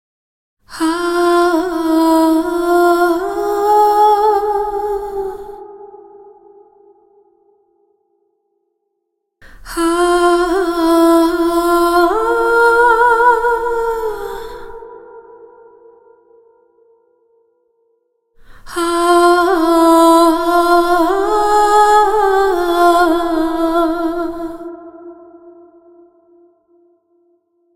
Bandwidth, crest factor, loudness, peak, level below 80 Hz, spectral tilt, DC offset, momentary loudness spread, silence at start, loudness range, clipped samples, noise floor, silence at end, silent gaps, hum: 16.5 kHz; 14 dB; -13 LUFS; 0 dBFS; -42 dBFS; -3.5 dB/octave; under 0.1%; 16 LU; 0.7 s; 15 LU; under 0.1%; -72 dBFS; 2.25 s; none; none